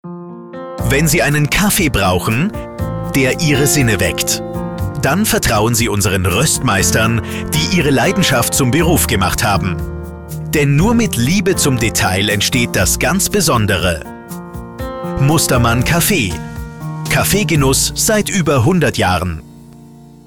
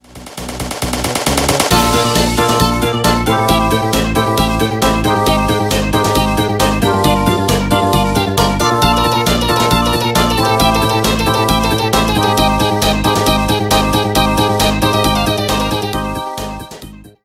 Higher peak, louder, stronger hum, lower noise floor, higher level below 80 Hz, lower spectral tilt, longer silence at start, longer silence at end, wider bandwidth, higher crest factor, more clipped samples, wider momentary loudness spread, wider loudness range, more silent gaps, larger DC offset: second, -4 dBFS vs 0 dBFS; about the same, -14 LUFS vs -13 LUFS; neither; first, -38 dBFS vs -34 dBFS; about the same, -30 dBFS vs -26 dBFS; about the same, -4 dB/octave vs -4.5 dB/octave; about the same, 0.05 s vs 0.15 s; about the same, 0.05 s vs 0.15 s; first, 19.5 kHz vs 16.5 kHz; about the same, 12 dB vs 14 dB; neither; first, 14 LU vs 6 LU; about the same, 2 LU vs 1 LU; neither; first, 0.4% vs under 0.1%